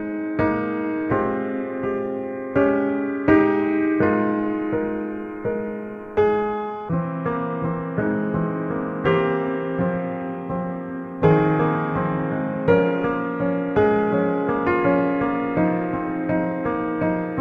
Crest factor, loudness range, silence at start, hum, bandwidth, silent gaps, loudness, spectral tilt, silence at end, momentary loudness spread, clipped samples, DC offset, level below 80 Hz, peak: 18 dB; 4 LU; 0 s; none; 5 kHz; none; -22 LUFS; -10 dB/octave; 0 s; 9 LU; under 0.1%; under 0.1%; -48 dBFS; -4 dBFS